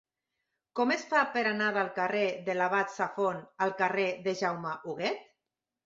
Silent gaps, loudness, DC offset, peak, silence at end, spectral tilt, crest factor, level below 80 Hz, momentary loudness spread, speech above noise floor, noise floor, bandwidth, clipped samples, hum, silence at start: none; -30 LUFS; under 0.1%; -12 dBFS; 0.6 s; -4.5 dB/octave; 20 dB; -78 dBFS; 7 LU; 58 dB; -88 dBFS; 7.8 kHz; under 0.1%; none; 0.75 s